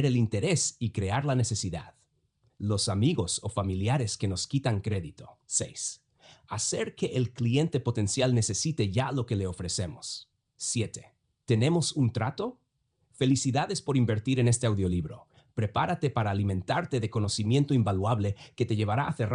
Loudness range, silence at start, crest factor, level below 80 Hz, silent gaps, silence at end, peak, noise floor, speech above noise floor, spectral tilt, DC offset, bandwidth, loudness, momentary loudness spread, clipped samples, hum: 3 LU; 0 s; 16 dB; -60 dBFS; none; 0 s; -14 dBFS; -75 dBFS; 47 dB; -5 dB/octave; under 0.1%; 10.5 kHz; -29 LUFS; 10 LU; under 0.1%; none